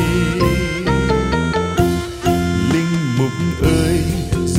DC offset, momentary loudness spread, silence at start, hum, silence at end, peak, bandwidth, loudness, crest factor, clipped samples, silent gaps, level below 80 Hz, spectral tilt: under 0.1%; 3 LU; 0 s; none; 0 s; -2 dBFS; 16 kHz; -17 LUFS; 14 dB; under 0.1%; none; -28 dBFS; -6 dB/octave